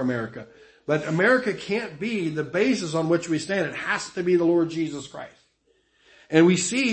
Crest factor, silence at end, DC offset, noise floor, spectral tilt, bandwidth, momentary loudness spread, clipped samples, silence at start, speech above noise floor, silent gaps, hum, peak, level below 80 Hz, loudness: 20 dB; 0 s; under 0.1%; -66 dBFS; -5 dB/octave; 8.8 kHz; 16 LU; under 0.1%; 0 s; 43 dB; none; none; -4 dBFS; -64 dBFS; -23 LUFS